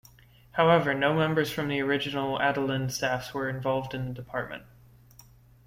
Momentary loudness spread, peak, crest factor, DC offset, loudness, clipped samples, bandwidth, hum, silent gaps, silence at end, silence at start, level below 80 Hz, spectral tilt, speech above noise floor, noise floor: 12 LU; -8 dBFS; 20 dB; under 0.1%; -27 LUFS; under 0.1%; 16.5 kHz; none; none; 1.05 s; 0.55 s; -58 dBFS; -5.5 dB/octave; 28 dB; -56 dBFS